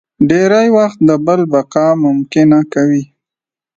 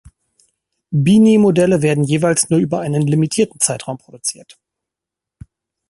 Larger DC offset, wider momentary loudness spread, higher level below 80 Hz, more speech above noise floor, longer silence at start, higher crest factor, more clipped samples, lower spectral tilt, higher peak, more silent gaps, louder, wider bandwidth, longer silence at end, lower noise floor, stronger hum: neither; second, 4 LU vs 13 LU; about the same, -54 dBFS vs -52 dBFS; first, 78 dB vs 70 dB; second, 0.2 s vs 0.9 s; about the same, 12 dB vs 16 dB; neither; first, -7 dB/octave vs -5.5 dB/octave; about the same, 0 dBFS vs 0 dBFS; neither; first, -11 LUFS vs -15 LUFS; second, 7.6 kHz vs 11.5 kHz; second, 0.7 s vs 1.6 s; about the same, -88 dBFS vs -85 dBFS; neither